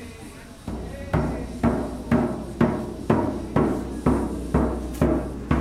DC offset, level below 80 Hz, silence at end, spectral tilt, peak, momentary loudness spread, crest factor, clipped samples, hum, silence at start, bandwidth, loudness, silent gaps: under 0.1%; -34 dBFS; 0 s; -8 dB/octave; -4 dBFS; 11 LU; 20 dB; under 0.1%; none; 0 s; 15 kHz; -25 LUFS; none